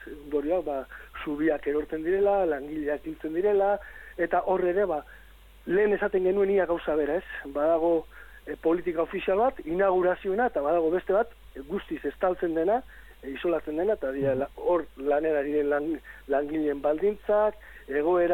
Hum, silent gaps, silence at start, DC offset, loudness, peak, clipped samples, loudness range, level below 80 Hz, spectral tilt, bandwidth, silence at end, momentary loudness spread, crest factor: none; none; 0 s; under 0.1%; -27 LUFS; -14 dBFS; under 0.1%; 2 LU; -52 dBFS; -7.5 dB/octave; 16.5 kHz; 0 s; 10 LU; 14 dB